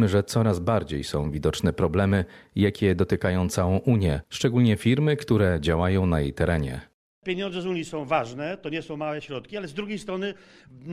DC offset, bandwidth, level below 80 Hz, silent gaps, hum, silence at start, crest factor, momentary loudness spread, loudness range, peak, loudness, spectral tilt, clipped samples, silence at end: under 0.1%; 14.5 kHz; -42 dBFS; 6.94-7.22 s; none; 0 s; 16 dB; 11 LU; 7 LU; -8 dBFS; -25 LUFS; -6.5 dB/octave; under 0.1%; 0 s